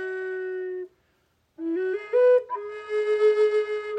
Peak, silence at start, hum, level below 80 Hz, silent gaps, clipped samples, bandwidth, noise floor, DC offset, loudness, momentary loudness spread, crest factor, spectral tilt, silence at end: -12 dBFS; 0 s; none; -76 dBFS; none; under 0.1%; 8.4 kHz; -69 dBFS; under 0.1%; -24 LUFS; 14 LU; 14 dB; -4 dB/octave; 0 s